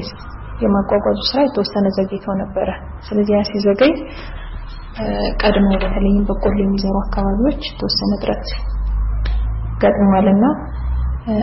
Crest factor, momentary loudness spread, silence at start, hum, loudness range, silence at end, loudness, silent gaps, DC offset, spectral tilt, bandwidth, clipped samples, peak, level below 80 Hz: 14 dB; 12 LU; 0 s; none; 2 LU; 0 s; -18 LUFS; none; under 0.1%; -5.5 dB/octave; 6 kHz; under 0.1%; -2 dBFS; -24 dBFS